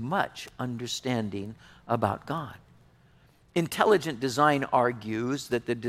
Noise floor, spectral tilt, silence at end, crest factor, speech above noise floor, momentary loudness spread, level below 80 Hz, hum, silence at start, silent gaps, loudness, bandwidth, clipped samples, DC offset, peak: -60 dBFS; -5 dB/octave; 0 s; 22 dB; 32 dB; 12 LU; -62 dBFS; none; 0 s; none; -28 LUFS; 16 kHz; under 0.1%; under 0.1%; -8 dBFS